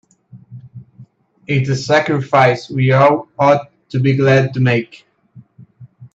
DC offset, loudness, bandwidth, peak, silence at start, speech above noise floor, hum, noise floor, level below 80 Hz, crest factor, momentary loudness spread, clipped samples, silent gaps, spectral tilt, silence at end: under 0.1%; -14 LUFS; 7.8 kHz; 0 dBFS; 0.35 s; 31 dB; none; -45 dBFS; -56 dBFS; 16 dB; 7 LU; under 0.1%; none; -7 dB/octave; 0.1 s